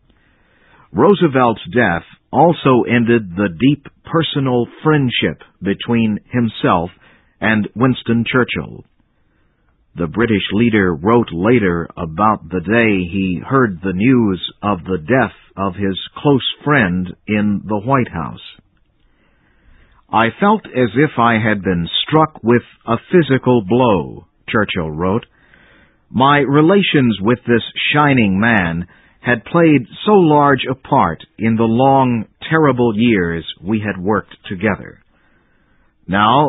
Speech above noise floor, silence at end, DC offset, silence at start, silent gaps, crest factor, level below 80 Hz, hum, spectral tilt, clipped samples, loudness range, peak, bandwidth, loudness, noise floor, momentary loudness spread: 43 dB; 0 s; under 0.1%; 0.95 s; none; 16 dB; -42 dBFS; none; -10.5 dB/octave; under 0.1%; 5 LU; 0 dBFS; 4.1 kHz; -15 LUFS; -58 dBFS; 9 LU